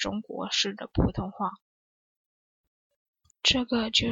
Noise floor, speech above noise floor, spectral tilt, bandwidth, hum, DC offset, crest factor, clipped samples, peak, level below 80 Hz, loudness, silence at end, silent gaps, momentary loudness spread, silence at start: under -90 dBFS; over 62 dB; -3.5 dB/octave; 8 kHz; none; under 0.1%; 22 dB; under 0.1%; -8 dBFS; -44 dBFS; -27 LUFS; 0 s; 1.62-2.90 s, 2.96-3.14 s; 10 LU; 0 s